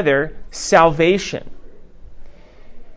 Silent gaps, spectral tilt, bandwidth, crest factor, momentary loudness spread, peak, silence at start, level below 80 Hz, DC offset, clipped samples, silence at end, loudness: none; -4.5 dB/octave; 8 kHz; 18 dB; 14 LU; 0 dBFS; 0 s; -42 dBFS; under 0.1%; under 0.1%; 0 s; -16 LUFS